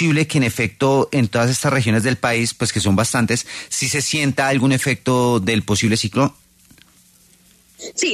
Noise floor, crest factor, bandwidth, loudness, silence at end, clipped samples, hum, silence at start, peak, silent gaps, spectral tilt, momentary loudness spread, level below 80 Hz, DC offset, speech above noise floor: -52 dBFS; 14 dB; 13.5 kHz; -18 LUFS; 0 s; under 0.1%; none; 0 s; -4 dBFS; none; -4.5 dB/octave; 4 LU; -50 dBFS; under 0.1%; 35 dB